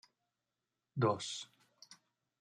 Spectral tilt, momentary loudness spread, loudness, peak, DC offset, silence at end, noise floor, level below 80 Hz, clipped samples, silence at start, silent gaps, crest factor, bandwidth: -5 dB/octave; 24 LU; -38 LUFS; -18 dBFS; under 0.1%; 0.45 s; -90 dBFS; -84 dBFS; under 0.1%; 0.95 s; none; 24 dB; 11 kHz